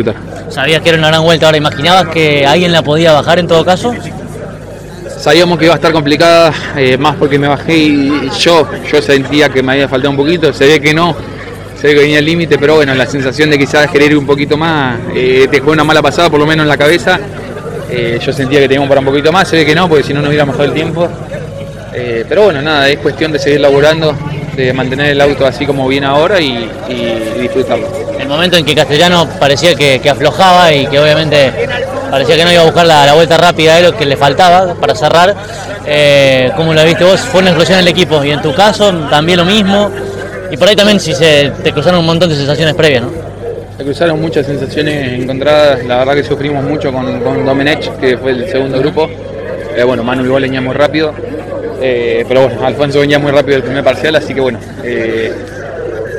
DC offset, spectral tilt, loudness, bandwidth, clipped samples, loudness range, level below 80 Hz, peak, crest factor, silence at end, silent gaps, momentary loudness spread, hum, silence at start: under 0.1%; -5 dB/octave; -9 LUFS; over 20 kHz; 3%; 5 LU; -36 dBFS; 0 dBFS; 8 dB; 0 s; none; 12 LU; none; 0 s